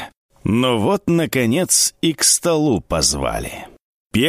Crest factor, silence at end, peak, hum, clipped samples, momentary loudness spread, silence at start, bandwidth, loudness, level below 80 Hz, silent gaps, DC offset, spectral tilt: 18 dB; 0 s; 0 dBFS; none; under 0.1%; 13 LU; 0 s; 15.5 kHz; -17 LUFS; -40 dBFS; 0.17-0.29 s, 3.82-4.10 s; under 0.1%; -3.5 dB/octave